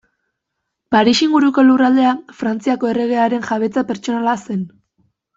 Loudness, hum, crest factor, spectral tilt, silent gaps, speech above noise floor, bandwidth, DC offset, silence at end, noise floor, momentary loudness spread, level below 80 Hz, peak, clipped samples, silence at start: -16 LUFS; none; 14 dB; -5 dB/octave; none; 62 dB; 7.8 kHz; under 0.1%; 0.7 s; -77 dBFS; 10 LU; -58 dBFS; -2 dBFS; under 0.1%; 0.9 s